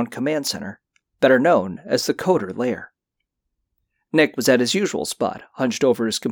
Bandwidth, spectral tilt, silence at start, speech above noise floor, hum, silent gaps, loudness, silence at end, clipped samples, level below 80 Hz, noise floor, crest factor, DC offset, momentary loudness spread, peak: over 20 kHz; -4 dB/octave; 0 s; 60 dB; none; none; -20 LUFS; 0 s; under 0.1%; -62 dBFS; -80 dBFS; 16 dB; under 0.1%; 9 LU; -4 dBFS